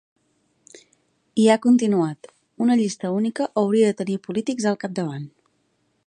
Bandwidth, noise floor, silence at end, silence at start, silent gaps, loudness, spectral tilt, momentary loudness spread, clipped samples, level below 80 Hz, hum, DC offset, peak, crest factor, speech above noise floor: 10.5 kHz; -68 dBFS; 0.8 s; 1.35 s; none; -21 LUFS; -6 dB/octave; 11 LU; under 0.1%; -72 dBFS; none; under 0.1%; -4 dBFS; 18 dB; 48 dB